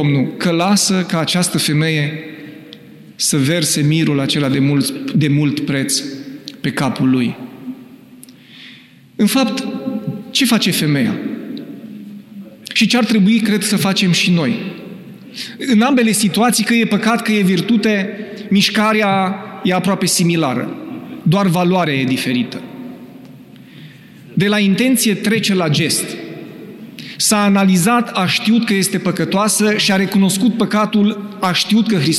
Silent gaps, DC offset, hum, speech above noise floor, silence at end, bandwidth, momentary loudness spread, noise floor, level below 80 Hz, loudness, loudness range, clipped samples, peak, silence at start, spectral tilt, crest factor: none; under 0.1%; none; 27 dB; 0 s; 15 kHz; 18 LU; -42 dBFS; -60 dBFS; -15 LUFS; 5 LU; under 0.1%; -4 dBFS; 0 s; -4.5 dB/octave; 12 dB